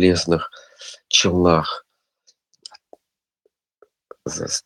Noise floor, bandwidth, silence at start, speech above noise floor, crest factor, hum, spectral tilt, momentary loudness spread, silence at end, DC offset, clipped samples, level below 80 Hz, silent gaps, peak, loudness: -76 dBFS; 12.5 kHz; 0 s; 58 dB; 22 dB; none; -4 dB/octave; 26 LU; 0.05 s; under 0.1%; under 0.1%; -48 dBFS; none; 0 dBFS; -19 LUFS